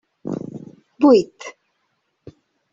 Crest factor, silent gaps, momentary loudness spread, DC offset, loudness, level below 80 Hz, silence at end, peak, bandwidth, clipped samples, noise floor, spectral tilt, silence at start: 20 dB; none; 23 LU; under 0.1%; -18 LUFS; -64 dBFS; 1.25 s; -2 dBFS; 7.6 kHz; under 0.1%; -71 dBFS; -6.5 dB/octave; 0.25 s